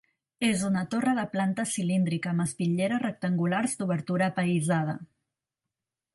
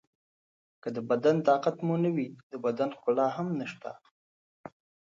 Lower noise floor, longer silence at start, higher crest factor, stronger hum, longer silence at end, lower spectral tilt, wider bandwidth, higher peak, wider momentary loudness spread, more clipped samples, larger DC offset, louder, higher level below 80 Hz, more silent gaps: about the same, -88 dBFS vs under -90 dBFS; second, 0.4 s vs 0.85 s; about the same, 16 dB vs 18 dB; neither; first, 1.1 s vs 0.45 s; second, -5.5 dB/octave vs -8 dB/octave; first, 11.5 kHz vs 7.4 kHz; about the same, -12 dBFS vs -12 dBFS; second, 3 LU vs 14 LU; neither; neither; about the same, -28 LUFS vs -29 LUFS; first, -68 dBFS vs -80 dBFS; second, none vs 2.43-2.50 s, 4.11-4.64 s